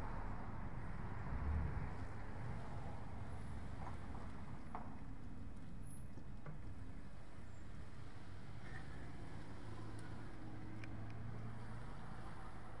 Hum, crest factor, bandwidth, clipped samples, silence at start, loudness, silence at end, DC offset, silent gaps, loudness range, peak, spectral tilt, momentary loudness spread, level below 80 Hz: none; 18 dB; 11 kHz; under 0.1%; 0 s; -51 LUFS; 0 s; 0.5%; none; 7 LU; -30 dBFS; -7 dB/octave; 8 LU; -54 dBFS